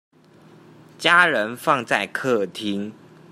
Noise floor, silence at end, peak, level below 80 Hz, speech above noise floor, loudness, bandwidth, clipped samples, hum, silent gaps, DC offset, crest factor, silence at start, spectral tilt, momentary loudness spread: -50 dBFS; 0.4 s; -2 dBFS; -70 dBFS; 30 dB; -20 LUFS; 15.5 kHz; under 0.1%; none; none; under 0.1%; 22 dB; 1 s; -4 dB/octave; 12 LU